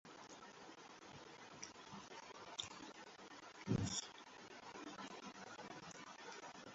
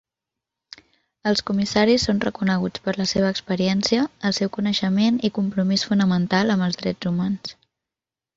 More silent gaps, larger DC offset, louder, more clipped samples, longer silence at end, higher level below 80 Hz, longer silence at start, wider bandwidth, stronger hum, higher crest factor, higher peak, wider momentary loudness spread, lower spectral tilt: neither; neither; second, -51 LUFS vs -21 LUFS; neither; second, 0 s vs 0.85 s; second, -72 dBFS vs -52 dBFS; second, 0.05 s vs 1.25 s; about the same, 7.6 kHz vs 7.8 kHz; neither; first, 24 dB vs 18 dB; second, -26 dBFS vs -4 dBFS; first, 14 LU vs 5 LU; second, -4 dB/octave vs -5.5 dB/octave